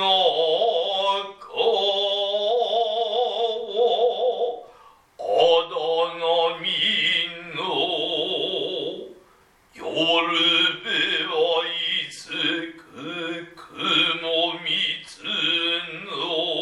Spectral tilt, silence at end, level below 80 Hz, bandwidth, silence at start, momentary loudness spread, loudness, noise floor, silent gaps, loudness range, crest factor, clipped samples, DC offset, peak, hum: -3 dB/octave; 0 s; -70 dBFS; 11 kHz; 0 s; 11 LU; -22 LUFS; -57 dBFS; none; 3 LU; 18 dB; under 0.1%; under 0.1%; -6 dBFS; none